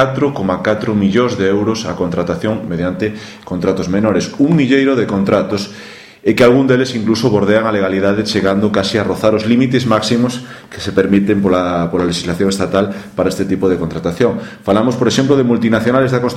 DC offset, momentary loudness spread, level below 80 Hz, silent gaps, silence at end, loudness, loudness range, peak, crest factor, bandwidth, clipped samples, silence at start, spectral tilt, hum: under 0.1%; 7 LU; -44 dBFS; none; 0 s; -14 LUFS; 3 LU; 0 dBFS; 14 dB; 15 kHz; under 0.1%; 0 s; -6 dB/octave; none